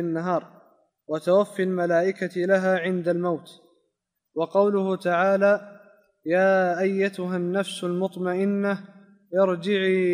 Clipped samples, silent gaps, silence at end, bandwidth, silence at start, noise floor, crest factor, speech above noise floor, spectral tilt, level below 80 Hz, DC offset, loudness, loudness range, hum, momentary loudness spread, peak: under 0.1%; none; 0 s; 14 kHz; 0 s; -78 dBFS; 16 dB; 55 dB; -6.5 dB/octave; -78 dBFS; under 0.1%; -24 LUFS; 2 LU; none; 8 LU; -8 dBFS